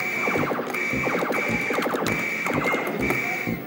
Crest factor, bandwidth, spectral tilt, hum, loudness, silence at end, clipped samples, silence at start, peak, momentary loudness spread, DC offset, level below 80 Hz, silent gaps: 16 dB; 17 kHz; -4.5 dB/octave; none; -24 LUFS; 0 s; under 0.1%; 0 s; -8 dBFS; 2 LU; under 0.1%; -50 dBFS; none